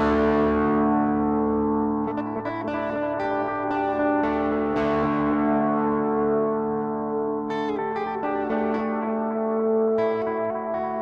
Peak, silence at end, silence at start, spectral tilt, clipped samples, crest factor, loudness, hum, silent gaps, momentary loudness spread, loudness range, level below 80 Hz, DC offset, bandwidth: -12 dBFS; 0 s; 0 s; -8.5 dB/octave; under 0.1%; 12 dB; -24 LUFS; none; none; 6 LU; 2 LU; -48 dBFS; under 0.1%; 6.6 kHz